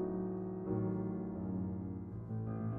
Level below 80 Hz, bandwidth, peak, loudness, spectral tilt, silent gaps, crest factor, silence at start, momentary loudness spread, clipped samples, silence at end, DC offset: -60 dBFS; 2.5 kHz; -26 dBFS; -40 LUFS; -13 dB/octave; none; 14 dB; 0 s; 6 LU; under 0.1%; 0 s; under 0.1%